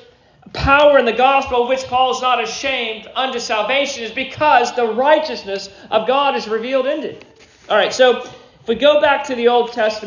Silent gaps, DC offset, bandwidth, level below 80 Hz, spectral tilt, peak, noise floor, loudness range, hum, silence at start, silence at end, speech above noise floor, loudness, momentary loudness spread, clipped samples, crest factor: none; under 0.1%; 7.6 kHz; -42 dBFS; -3.5 dB/octave; 0 dBFS; -46 dBFS; 3 LU; none; 0.55 s; 0 s; 30 dB; -16 LUFS; 11 LU; under 0.1%; 16 dB